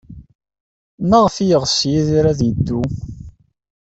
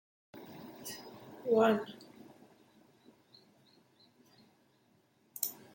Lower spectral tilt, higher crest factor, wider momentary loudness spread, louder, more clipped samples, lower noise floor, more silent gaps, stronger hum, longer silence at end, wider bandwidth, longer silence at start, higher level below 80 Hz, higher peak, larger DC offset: first, -6 dB/octave vs -4.5 dB/octave; second, 16 dB vs 26 dB; second, 14 LU vs 28 LU; first, -16 LUFS vs -34 LUFS; neither; second, -39 dBFS vs -71 dBFS; first, 0.35-0.39 s, 0.60-0.98 s vs none; neither; first, 0.5 s vs 0.2 s; second, 8.2 kHz vs 17 kHz; second, 0.1 s vs 0.35 s; first, -40 dBFS vs -82 dBFS; first, -2 dBFS vs -14 dBFS; neither